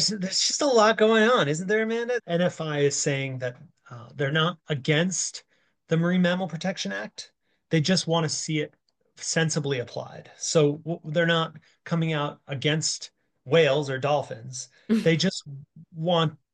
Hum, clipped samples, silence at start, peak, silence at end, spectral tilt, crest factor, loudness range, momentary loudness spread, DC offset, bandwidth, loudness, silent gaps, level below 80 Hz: none; under 0.1%; 0 s; -8 dBFS; 0.2 s; -4 dB/octave; 18 dB; 4 LU; 16 LU; under 0.1%; 10 kHz; -25 LUFS; none; -72 dBFS